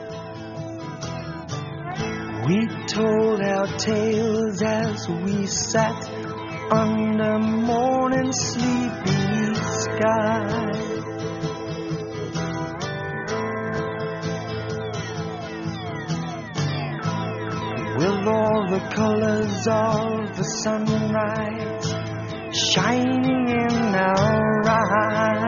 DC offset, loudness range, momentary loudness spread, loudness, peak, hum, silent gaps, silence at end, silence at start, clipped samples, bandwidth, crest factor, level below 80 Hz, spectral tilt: under 0.1%; 6 LU; 11 LU; -23 LUFS; -4 dBFS; none; none; 0 s; 0 s; under 0.1%; 7.2 kHz; 18 dB; -52 dBFS; -5 dB/octave